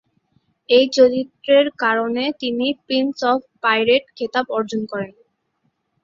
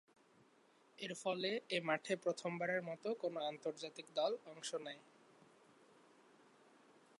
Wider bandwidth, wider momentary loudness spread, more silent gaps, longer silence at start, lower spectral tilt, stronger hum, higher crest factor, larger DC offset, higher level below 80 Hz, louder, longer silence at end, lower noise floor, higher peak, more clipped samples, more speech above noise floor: second, 7.6 kHz vs 11.5 kHz; about the same, 9 LU vs 9 LU; neither; second, 0.7 s vs 1 s; about the same, -4 dB/octave vs -4 dB/octave; neither; about the same, 18 dB vs 20 dB; neither; first, -64 dBFS vs under -90 dBFS; first, -18 LUFS vs -42 LUFS; second, 0.95 s vs 2.2 s; about the same, -69 dBFS vs -71 dBFS; first, -2 dBFS vs -24 dBFS; neither; first, 51 dB vs 29 dB